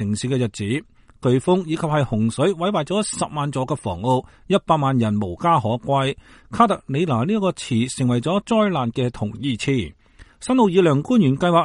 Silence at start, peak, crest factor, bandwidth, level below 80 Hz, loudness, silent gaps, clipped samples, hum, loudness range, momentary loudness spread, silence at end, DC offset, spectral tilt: 0 s; -2 dBFS; 18 dB; 11.5 kHz; -50 dBFS; -21 LUFS; none; under 0.1%; none; 2 LU; 8 LU; 0 s; under 0.1%; -6 dB/octave